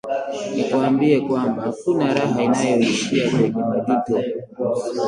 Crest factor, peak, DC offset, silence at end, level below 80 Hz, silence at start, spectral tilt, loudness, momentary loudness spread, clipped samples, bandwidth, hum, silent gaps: 16 dB; -4 dBFS; under 0.1%; 0 s; -60 dBFS; 0.05 s; -5.5 dB/octave; -20 LUFS; 7 LU; under 0.1%; 11 kHz; none; none